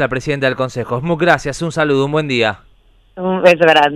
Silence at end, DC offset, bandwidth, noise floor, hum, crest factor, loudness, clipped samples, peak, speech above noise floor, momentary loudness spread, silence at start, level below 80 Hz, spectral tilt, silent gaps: 0 s; under 0.1%; 13 kHz; -49 dBFS; none; 14 dB; -15 LUFS; 0.1%; 0 dBFS; 35 dB; 11 LU; 0 s; -44 dBFS; -5.5 dB/octave; none